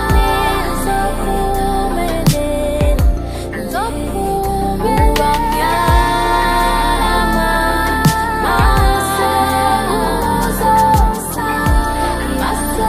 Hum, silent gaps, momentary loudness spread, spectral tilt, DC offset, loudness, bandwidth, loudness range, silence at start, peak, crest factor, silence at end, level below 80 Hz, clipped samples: none; none; 5 LU; -5 dB/octave; under 0.1%; -15 LUFS; 15.5 kHz; 3 LU; 0 s; 0 dBFS; 14 dB; 0 s; -20 dBFS; under 0.1%